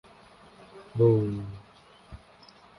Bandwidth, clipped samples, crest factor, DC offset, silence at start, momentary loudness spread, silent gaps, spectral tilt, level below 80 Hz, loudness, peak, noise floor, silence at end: 10.5 kHz; under 0.1%; 20 dB; under 0.1%; 0.75 s; 27 LU; none; -10 dB/octave; -56 dBFS; -26 LUFS; -10 dBFS; -55 dBFS; 0.65 s